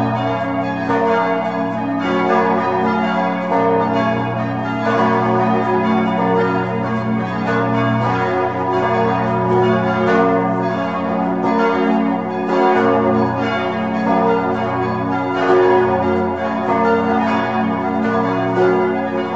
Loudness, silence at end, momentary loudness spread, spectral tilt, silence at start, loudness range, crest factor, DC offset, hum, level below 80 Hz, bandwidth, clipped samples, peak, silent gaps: -17 LUFS; 0 s; 5 LU; -8 dB/octave; 0 s; 1 LU; 14 dB; 0.4%; none; -52 dBFS; 7.8 kHz; under 0.1%; -2 dBFS; none